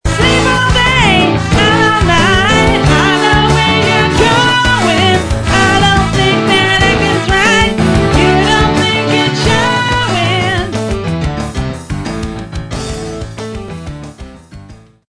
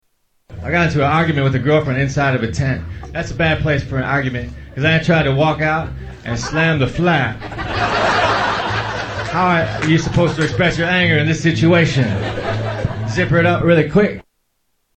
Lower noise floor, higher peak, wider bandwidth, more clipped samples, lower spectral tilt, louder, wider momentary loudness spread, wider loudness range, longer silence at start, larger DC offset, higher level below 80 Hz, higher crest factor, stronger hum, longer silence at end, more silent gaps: second, -36 dBFS vs -66 dBFS; about the same, 0 dBFS vs 0 dBFS; first, 11 kHz vs 8.6 kHz; first, 0.1% vs under 0.1%; second, -4.5 dB/octave vs -6 dB/octave; first, -10 LUFS vs -16 LUFS; first, 13 LU vs 10 LU; first, 11 LU vs 2 LU; second, 0.05 s vs 0.5 s; neither; first, -24 dBFS vs -36 dBFS; about the same, 12 dB vs 16 dB; neither; second, 0.35 s vs 0.75 s; neither